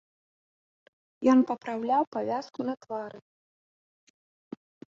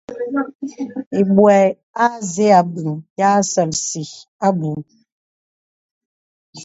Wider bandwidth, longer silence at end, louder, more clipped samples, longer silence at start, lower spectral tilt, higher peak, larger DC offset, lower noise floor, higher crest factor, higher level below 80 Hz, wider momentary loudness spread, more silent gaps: about the same, 7.4 kHz vs 8 kHz; first, 1.75 s vs 0 s; second, -28 LUFS vs -17 LUFS; neither; first, 1.2 s vs 0.1 s; about the same, -6 dB/octave vs -5 dB/octave; second, -12 dBFS vs 0 dBFS; neither; about the same, under -90 dBFS vs under -90 dBFS; about the same, 20 dB vs 18 dB; second, -76 dBFS vs -62 dBFS; first, 24 LU vs 15 LU; second, 2.07-2.12 s vs 0.55-0.59 s, 1.06-1.11 s, 1.83-1.94 s, 3.10-3.16 s, 4.28-4.39 s, 5.12-6.53 s